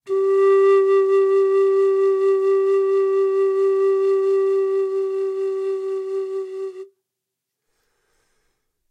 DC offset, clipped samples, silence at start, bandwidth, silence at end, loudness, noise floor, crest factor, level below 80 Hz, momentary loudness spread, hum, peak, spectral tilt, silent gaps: under 0.1%; under 0.1%; 0.05 s; 5.4 kHz; 2.05 s; -19 LUFS; -82 dBFS; 12 dB; -84 dBFS; 10 LU; none; -8 dBFS; -4.5 dB/octave; none